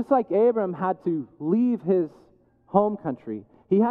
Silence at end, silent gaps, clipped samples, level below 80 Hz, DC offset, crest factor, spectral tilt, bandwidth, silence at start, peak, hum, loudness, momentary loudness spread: 0 s; none; under 0.1%; -70 dBFS; under 0.1%; 18 dB; -11 dB/octave; 4.2 kHz; 0 s; -6 dBFS; none; -24 LUFS; 12 LU